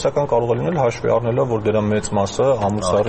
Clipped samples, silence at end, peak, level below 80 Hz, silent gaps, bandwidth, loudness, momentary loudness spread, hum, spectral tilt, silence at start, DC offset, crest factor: under 0.1%; 0 s; -6 dBFS; -42 dBFS; none; 8.8 kHz; -19 LUFS; 2 LU; none; -6 dB/octave; 0 s; under 0.1%; 12 dB